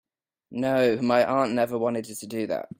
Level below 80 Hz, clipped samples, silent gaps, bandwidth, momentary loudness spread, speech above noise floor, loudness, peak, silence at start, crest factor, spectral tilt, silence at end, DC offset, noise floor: -66 dBFS; under 0.1%; none; 16.5 kHz; 11 LU; 27 dB; -25 LUFS; -8 dBFS; 0.5 s; 16 dB; -5.5 dB/octave; 0.15 s; under 0.1%; -52 dBFS